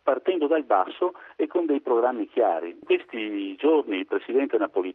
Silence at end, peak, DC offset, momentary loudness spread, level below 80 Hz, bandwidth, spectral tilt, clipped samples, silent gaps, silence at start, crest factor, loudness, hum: 0 s; -8 dBFS; under 0.1%; 7 LU; -78 dBFS; 4 kHz; -7 dB/octave; under 0.1%; none; 0.05 s; 16 dB; -25 LUFS; none